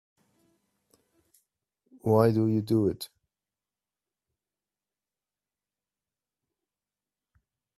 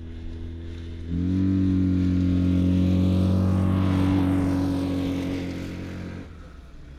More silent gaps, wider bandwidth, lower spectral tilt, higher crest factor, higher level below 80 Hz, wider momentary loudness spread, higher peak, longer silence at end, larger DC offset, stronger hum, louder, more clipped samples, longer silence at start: neither; first, 14 kHz vs 9.6 kHz; about the same, -8 dB/octave vs -8.5 dB/octave; first, 26 dB vs 12 dB; second, -68 dBFS vs -40 dBFS; about the same, 16 LU vs 15 LU; first, -8 dBFS vs -12 dBFS; first, 4.7 s vs 0 s; neither; first, 50 Hz at -70 dBFS vs none; second, -26 LUFS vs -23 LUFS; neither; first, 2.05 s vs 0 s